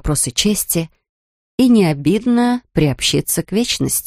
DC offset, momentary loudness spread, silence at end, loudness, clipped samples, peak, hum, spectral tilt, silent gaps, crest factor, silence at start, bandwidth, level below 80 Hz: under 0.1%; 6 LU; 0 s; -16 LUFS; under 0.1%; -2 dBFS; none; -4 dB/octave; 1.09-1.58 s; 14 dB; 0.05 s; 15.5 kHz; -38 dBFS